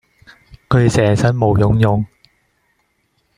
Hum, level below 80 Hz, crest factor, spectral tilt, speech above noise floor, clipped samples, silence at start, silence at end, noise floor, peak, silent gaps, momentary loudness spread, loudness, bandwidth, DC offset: none; -38 dBFS; 16 dB; -7 dB/octave; 51 dB; under 0.1%; 0.7 s; 1.3 s; -64 dBFS; -2 dBFS; none; 6 LU; -15 LUFS; 11 kHz; under 0.1%